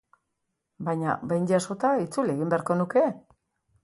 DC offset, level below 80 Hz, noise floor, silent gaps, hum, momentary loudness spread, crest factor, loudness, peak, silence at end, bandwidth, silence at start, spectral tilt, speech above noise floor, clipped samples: under 0.1%; -68 dBFS; -80 dBFS; none; none; 6 LU; 18 dB; -26 LUFS; -10 dBFS; 0.65 s; 11.5 kHz; 0.8 s; -7 dB/octave; 55 dB; under 0.1%